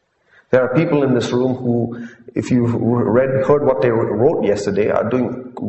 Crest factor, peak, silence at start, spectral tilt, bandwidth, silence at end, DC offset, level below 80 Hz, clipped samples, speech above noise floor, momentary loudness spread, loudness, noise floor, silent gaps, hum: 16 dB; 0 dBFS; 0.5 s; -7.5 dB/octave; 8.4 kHz; 0 s; under 0.1%; -50 dBFS; under 0.1%; 38 dB; 6 LU; -17 LUFS; -55 dBFS; none; none